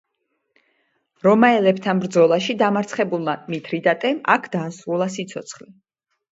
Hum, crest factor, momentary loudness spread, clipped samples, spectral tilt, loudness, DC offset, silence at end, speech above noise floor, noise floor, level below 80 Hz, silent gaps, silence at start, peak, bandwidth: none; 20 dB; 13 LU; under 0.1%; -5.5 dB/octave; -19 LUFS; under 0.1%; 0.8 s; 54 dB; -74 dBFS; -68 dBFS; none; 1.25 s; 0 dBFS; 8 kHz